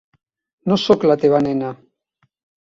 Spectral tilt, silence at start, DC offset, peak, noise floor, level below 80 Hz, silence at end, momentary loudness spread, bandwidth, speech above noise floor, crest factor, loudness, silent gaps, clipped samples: -7 dB/octave; 0.65 s; under 0.1%; -2 dBFS; -67 dBFS; -58 dBFS; 0.85 s; 12 LU; 7.6 kHz; 51 dB; 18 dB; -17 LUFS; none; under 0.1%